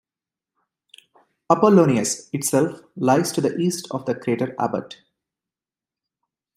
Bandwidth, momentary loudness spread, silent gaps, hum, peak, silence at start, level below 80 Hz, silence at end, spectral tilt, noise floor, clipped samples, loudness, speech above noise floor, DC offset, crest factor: 16 kHz; 11 LU; none; none; -2 dBFS; 1.5 s; -66 dBFS; 1.65 s; -5.5 dB/octave; under -90 dBFS; under 0.1%; -21 LUFS; over 70 dB; under 0.1%; 22 dB